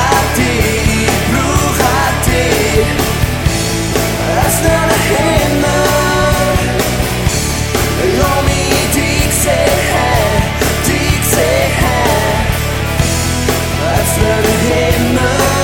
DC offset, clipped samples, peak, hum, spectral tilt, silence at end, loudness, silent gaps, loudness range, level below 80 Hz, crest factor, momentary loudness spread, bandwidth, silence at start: under 0.1%; under 0.1%; 0 dBFS; none; -4 dB/octave; 0 s; -12 LUFS; none; 1 LU; -22 dBFS; 12 dB; 3 LU; 17 kHz; 0 s